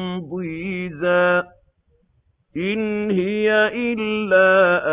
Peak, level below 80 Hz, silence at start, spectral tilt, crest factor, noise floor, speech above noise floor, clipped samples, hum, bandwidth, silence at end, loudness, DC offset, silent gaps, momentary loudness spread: -4 dBFS; -56 dBFS; 0 s; -9.5 dB/octave; 16 dB; -63 dBFS; 44 dB; under 0.1%; none; 4 kHz; 0 s; -19 LUFS; under 0.1%; none; 13 LU